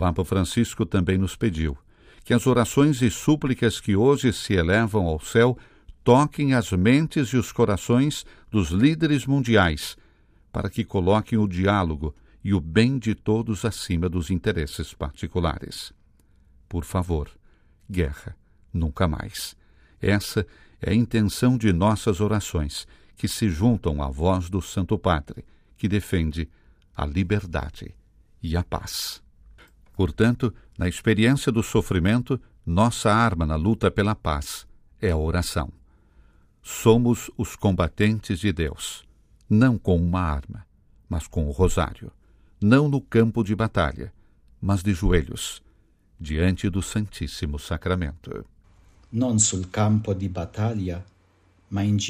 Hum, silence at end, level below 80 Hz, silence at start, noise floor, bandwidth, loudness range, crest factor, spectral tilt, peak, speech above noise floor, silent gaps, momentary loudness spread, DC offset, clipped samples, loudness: none; 0 s; -40 dBFS; 0 s; -60 dBFS; 16 kHz; 7 LU; 20 dB; -6 dB/octave; -4 dBFS; 37 dB; none; 14 LU; under 0.1%; under 0.1%; -24 LUFS